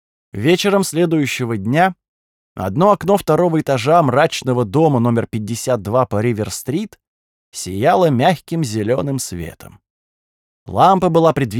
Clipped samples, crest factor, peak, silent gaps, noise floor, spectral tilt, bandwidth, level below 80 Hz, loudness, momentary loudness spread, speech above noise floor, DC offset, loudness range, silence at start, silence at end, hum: under 0.1%; 16 dB; -2 dBFS; 2.08-2.55 s, 7.07-7.52 s, 9.90-10.66 s; under -90 dBFS; -6 dB/octave; 19 kHz; -52 dBFS; -16 LUFS; 12 LU; over 74 dB; under 0.1%; 4 LU; 0.35 s; 0 s; none